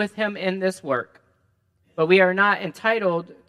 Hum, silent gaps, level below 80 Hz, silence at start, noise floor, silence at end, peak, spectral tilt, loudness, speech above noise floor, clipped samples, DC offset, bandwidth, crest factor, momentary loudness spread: none; none; -74 dBFS; 0 s; -66 dBFS; 0.15 s; -2 dBFS; -5.5 dB/octave; -21 LUFS; 45 dB; under 0.1%; under 0.1%; 12.5 kHz; 20 dB; 10 LU